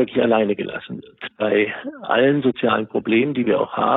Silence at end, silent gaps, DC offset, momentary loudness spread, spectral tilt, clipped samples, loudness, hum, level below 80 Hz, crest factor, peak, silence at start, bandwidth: 0 s; none; under 0.1%; 13 LU; -10 dB/octave; under 0.1%; -20 LUFS; none; -62 dBFS; 14 dB; -4 dBFS; 0 s; 4.1 kHz